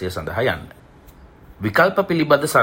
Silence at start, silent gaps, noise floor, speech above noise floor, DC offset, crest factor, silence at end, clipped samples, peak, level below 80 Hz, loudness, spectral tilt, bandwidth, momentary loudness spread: 0 s; none; -45 dBFS; 27 dB; under 0.1%; 18 dB; 0 s; under 0.1%; -2 dBFS; -48 dBFS; -19 LUFS; -5 dB/octave; 16.5 kHz; 10 LU